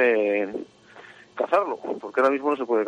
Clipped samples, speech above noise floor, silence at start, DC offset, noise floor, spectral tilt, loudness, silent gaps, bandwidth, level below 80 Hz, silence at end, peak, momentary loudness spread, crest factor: under 0.1%; 25 dB; 0 s; under 0.1%; -48 dBFS; -5.5 dB/octave; -24 LUFS; none; 9.2 kHz; -74 dBFS; 0 s; -8 dBFS; 14 LU; 16 dB